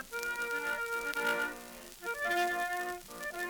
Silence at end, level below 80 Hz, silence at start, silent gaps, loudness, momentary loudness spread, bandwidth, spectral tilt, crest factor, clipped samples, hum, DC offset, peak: 0 s; -64 dBFS; 0 s; none; -35 LUFS; 10 LU; over 20 kHz; -1.5 dB/octave; 20 dB; under 0.1%; none; under 0.1%; -16 dBFS